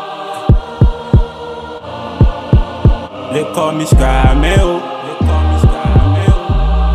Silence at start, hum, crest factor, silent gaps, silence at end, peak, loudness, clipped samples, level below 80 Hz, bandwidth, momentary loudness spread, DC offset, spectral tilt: 0 s; none; 10 dB; none; 0 s; 0 dBFS; -13 LUFS; under 0.1%; -14 dBFS; 13 kHz; 12 LU; under 0.1%; -7 dB/octave